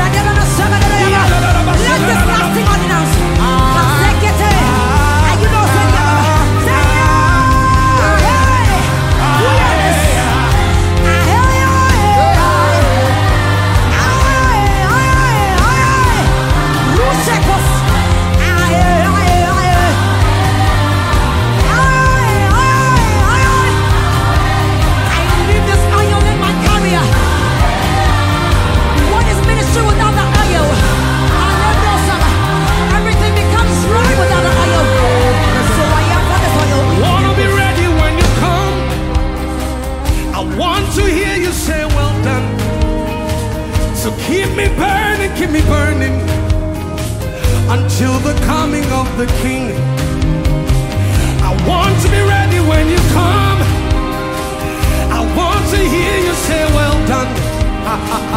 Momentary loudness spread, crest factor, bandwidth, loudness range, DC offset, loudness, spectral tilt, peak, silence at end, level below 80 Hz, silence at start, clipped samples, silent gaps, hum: 6 LU; 10 dB; 16.5 kHz; 4 LU; under 0.1%; -12 LUFS; -5 dB/octave; 0 dBFS; 0 s; -18 dBFS; 0 s; under 0.1%; none; none